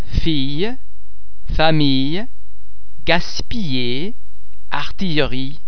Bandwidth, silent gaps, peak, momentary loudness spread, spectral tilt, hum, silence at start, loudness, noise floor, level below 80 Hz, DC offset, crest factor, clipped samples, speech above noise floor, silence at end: 5.4 kHz; none; 0 dBFS; 12 LU; -6 dB/octave; none; 0 s; -20 LUFS; -46 dBFS; -30 dBFS; 20%; 22 dB; under 0.1%; 27 dB; 0 s